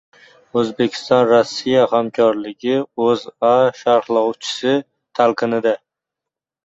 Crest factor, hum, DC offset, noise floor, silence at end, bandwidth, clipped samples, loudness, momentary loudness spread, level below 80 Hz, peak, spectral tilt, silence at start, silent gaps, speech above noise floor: 16 dB; none; under 0.1%; -85 dBFS; 0.9 s; 8 kHz; under 0.1%; -17 LUFS; 7 LU; -62 dBFS; -2 dBFS; -5 dB/octave; 0.55 s; none; 69 dB